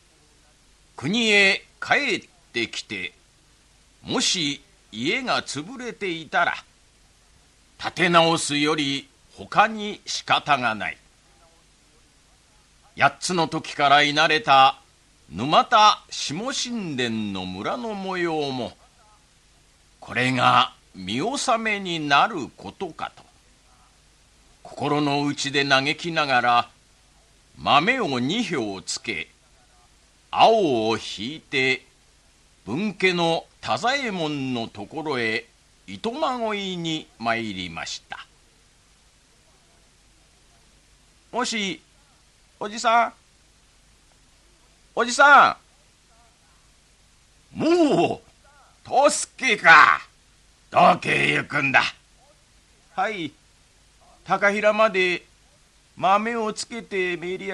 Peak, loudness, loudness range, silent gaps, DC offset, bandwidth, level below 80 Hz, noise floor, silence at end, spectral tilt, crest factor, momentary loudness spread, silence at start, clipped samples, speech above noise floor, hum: 0 dBFS; -21 LUFS; 10 LU; none; under 0.1%; 12 kHz; -60 dBFS; -57 dBFS; 0 s; -3.5 dB/octave; 24 dB; 16 LU; 1 s; under 0.1%; 36 dB; none